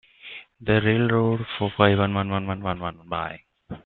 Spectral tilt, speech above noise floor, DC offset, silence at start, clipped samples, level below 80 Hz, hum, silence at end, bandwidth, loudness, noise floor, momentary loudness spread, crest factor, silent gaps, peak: -11 dB/octave; 21 dB; under 0.1%; 0.25 s; under 0.1%; -52 dBFS; none; 0.05 s; 4.3 kHz; -23 LUFS; -44 dBFS; 20 LU; 22 dB; none; -2 dBFS